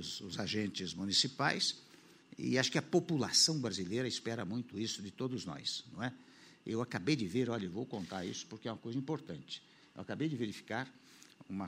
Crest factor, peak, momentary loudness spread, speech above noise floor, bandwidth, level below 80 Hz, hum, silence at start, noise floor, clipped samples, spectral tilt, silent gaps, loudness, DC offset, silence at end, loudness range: 24 dB; -14 dBFS; 15 LU; 22 dB; 16 kHz; -74 dBFS; none; 0 s; -59 dBFS; under 0.1%; -3.5 dB/octave; none; -36 LUFS; under 0.1%; 0 s; 9 LU